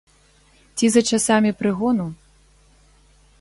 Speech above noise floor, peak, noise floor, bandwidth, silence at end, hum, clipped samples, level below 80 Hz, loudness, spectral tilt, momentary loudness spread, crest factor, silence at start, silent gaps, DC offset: 37 dB; -4 dBFS; -55 dBFS; 11.5 kHz; 1.25 s; 50 Hz at -50 dBFS; under 0.1%; -54 dBFS; -19 LUFS; -4 dB/octave; 11 LU; 20 dB; 0.75 s; none; under 0.1%